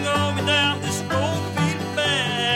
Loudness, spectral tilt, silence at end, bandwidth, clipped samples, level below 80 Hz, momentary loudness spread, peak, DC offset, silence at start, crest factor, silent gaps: -21 LUFS; -4 dB/octave; 0 s; 16.5 kHz; under 0.1%; -54 dBFS; 5 LU; -8 dBFS; under 0.1%; 0 s; 14 dB; none